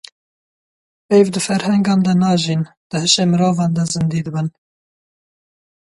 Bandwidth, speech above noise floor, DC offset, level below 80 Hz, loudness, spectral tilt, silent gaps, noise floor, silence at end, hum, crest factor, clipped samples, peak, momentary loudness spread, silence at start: 11.5 kHz; over 75 dB; under 0.1%; -56 dBFS; -16 LUFS; -5 dB/octave; 2.77-2.90 s; under -90 dBFS; 1.45 s; none; 16 dB; under 0.1%; -2 dBFS; 9 LU; 1.1 s